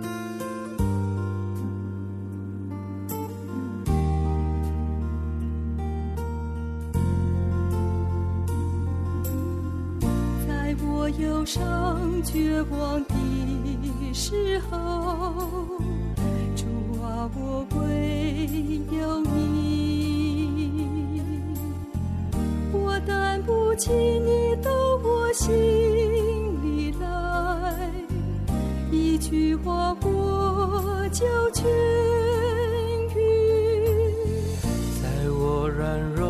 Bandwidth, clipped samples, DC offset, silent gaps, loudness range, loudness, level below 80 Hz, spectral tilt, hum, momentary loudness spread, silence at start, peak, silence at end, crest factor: 14 kHz; under 0.1%; under 0.1%; none; 6 LU; -26 LUFS; -34 dBFS; -6.5 dB/octave; none; 9 LU; 0 s; -12 dBFS; 0 s; 14 dB